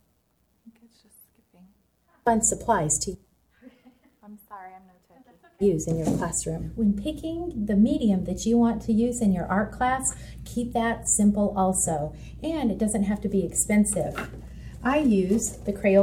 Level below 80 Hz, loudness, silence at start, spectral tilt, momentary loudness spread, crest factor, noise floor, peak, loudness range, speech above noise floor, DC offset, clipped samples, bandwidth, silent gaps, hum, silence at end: -44 dBFS; -25 LUFS; 0.65 s; -5 dB/octave; 13 LU; 18 dB; -69 dBFS; -8 dBFS; 6 LU; 44 dB; under 0.1%; under 0.1%; 16 kHz; none; none; 0 s